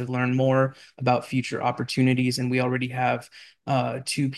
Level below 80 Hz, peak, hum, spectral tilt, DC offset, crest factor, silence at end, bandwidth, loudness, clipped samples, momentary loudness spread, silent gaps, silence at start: -64 dBFS; -8 dBFS; none; -6 dB/octave; under 0.1%; 16 dB; 0 s; 12.5 kHz; -25 LUFS; under 0.1%; 6 LU; none; 0 s